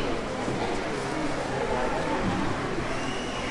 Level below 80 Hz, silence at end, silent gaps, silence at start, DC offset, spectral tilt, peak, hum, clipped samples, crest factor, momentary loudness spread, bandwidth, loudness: -40 dBFS; 0 s; none; 0 s; under 0.1%; -5 dB/octave; -16 dBFS; none; under 0.1%; 12 dB; 3 LU; 11.5 kHz; -29 LUFS